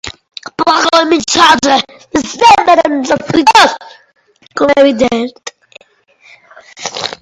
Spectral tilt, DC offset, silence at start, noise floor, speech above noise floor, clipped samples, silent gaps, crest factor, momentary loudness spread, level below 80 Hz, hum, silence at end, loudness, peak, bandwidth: -2.5 dB/octave; under 0.1%; 0.05 s; -48 dBFS; 39 dB; 0.7%; none; 12 dB; 19 LU; -46 dBFS; none; 0.1 s; -9 LUFS; 0 dBFS; 16 kHz